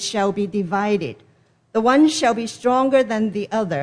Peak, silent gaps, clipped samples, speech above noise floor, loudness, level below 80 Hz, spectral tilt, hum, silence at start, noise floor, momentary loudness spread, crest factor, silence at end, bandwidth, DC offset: -4 dBFS; none; under 0.1%; 24 dB; -19 LUFS; -60 dBFS; -5 dB/octave; none; 0 s; -42 dBFS; 8 LU; 16 dB; 0 s; 10.5 kHz; under 0.1%